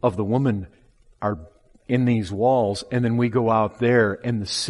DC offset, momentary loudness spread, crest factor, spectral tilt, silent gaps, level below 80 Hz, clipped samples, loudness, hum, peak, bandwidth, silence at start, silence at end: under 0.1%; 9 LU; 18 dB; -6 dB/octave; none; -54 dBFS; under 0.1%; -22 LUFS; none; -4 dBFS; 11.5 kHz; 0.05 s; 0 s